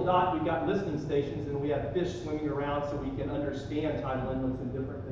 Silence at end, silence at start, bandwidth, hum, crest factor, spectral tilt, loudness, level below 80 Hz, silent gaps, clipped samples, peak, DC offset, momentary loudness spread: 0 s; 0 s; 7.8 kHz; none; 16 dB; -7.5 dB/octave; -32 LUFS; -48 dBFS; none; under 0.1%; -14 dBFS; under 0.1%; 5 LU